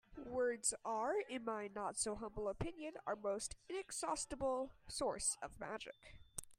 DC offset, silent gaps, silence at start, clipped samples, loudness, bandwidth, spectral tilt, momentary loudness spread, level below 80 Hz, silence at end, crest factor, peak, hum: under 0.1%; none; 0.1 s; under 0.1%; -43 LUFS; 15.5 kHz; -2.5 dB/octave; 9 LU; -64 dBFS; 0.05 s; 20 dB; -24 dBFS; none